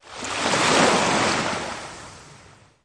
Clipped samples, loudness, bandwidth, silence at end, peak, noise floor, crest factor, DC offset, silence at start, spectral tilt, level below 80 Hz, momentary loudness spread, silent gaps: under 0.1%; -20 LUFS; 11.5 kHz; 0.5 s; -4 dBFS; -50 dBFS; 18 dB; under 0.1%; 0.05 s; -2.5 dB/octave; -54 dBFS; 20 LU; none